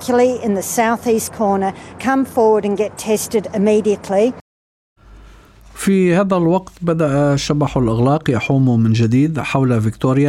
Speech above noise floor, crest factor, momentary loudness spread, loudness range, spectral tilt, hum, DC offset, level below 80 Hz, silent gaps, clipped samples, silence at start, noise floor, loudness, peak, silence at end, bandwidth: 27 dB; 14 dB; 5 LU; 3 LU; -6.5 dB/octave; none; under 0.1%; -44 dBFS; 4.41-4.96 s; under 0.1%; 0 s; -42 dBFS; -16 LUFS; -2 dBFS; 0 s; 15.5 kHz